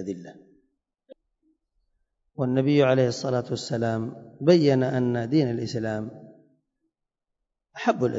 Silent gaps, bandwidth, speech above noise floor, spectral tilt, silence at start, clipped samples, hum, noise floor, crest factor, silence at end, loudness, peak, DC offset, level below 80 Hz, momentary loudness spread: none; 7.8 kHz; 61 dB; -7 dB/octave; 0 s; under 0.1%; none; -84 dBFS; 20 dB; 0 s; -24 LUFS; -6 dBFS; under 0.1%; -66 dBFS; 15 LU